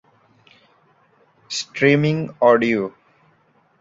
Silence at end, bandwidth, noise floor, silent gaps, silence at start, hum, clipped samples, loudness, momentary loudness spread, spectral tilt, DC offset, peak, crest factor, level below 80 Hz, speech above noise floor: 0.9 s; 7.8 kHz; -60 dBFS; none; 1.5 s; none; under 0.1%; -19 LUFS; 12 LU; -5.5 dB/octave; under 0.1%; -2 dBFS; 20 dB; -62 dBFS; 42 dB